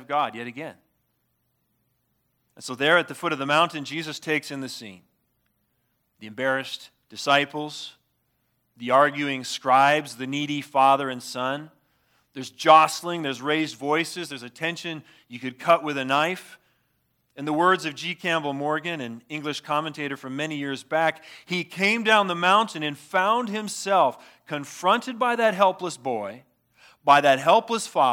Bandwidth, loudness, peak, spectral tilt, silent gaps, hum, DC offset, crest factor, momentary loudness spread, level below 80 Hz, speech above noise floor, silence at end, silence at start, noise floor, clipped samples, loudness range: 17.5 kHz; -23 LUFS; -2 dBFS; -4 dB/octave; none; none; under 0.1%; 22 dB; 16 LU; -80 dBFS; 49 dB; 0 s; 0 s; -73 dBFS; under 0.1%; 6 LU